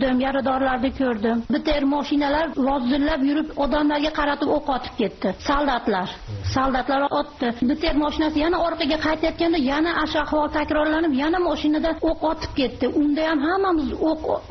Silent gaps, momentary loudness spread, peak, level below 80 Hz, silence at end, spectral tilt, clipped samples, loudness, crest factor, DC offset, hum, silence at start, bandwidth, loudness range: none; 4 LU; -10 dBFS; -38 dBFS; 0 s; -3.5 dB/octave; under 0.1%; -22 LUFS; 12 dB; under 0.1%; none; 0 s; 6.2 kHz; 2 LU